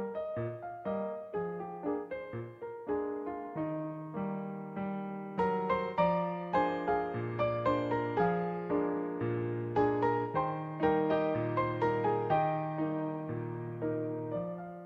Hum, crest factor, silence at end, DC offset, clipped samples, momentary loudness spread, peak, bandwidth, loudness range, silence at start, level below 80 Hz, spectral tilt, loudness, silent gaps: none; 18 dB; 0 s; under 0.1%; under 0.1%; 9 LU; -16 dBFS; 7.4 kHz; 7 LU; 0 s; -62 dBFS; -9.5 dB/octave; -34 LUFS; none